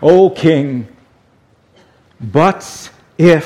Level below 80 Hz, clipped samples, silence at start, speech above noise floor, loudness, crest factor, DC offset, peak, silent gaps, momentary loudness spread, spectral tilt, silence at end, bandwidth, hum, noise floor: -50 dBFS; 0.2%; 0 s; 41 dB; -13 LUFS; 14 dB; under 0.1%; 0 dBFS; none; 22 LU; -7 dB/octave; 0 s; 13 kHz; none; -52 dBFS